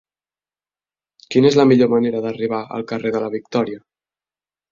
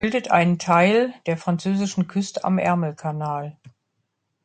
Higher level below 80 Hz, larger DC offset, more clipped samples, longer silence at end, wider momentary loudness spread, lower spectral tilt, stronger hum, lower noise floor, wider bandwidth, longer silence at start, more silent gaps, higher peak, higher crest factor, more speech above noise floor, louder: about the same, -60 dBFS vs -58 dBFS; neither; neither; first, 0.95 s vs 0.75 s; about the same, 12 LU vs 11 LU; about the same, -6.5 dB/octave vs -6 dB/octave; neither; first, under -90 dBFS vs -75 dBFS; second, 7.4 kHz vs 9.2 kHz; first, 1.3 s vs 0 s; neither; about the same, -2 dBFS vs -2 dBFS; about the same, 18 dB vs 20 dB; first, over 73 dB vs 54 dB; first, -18 LUFS vs -21 LUFS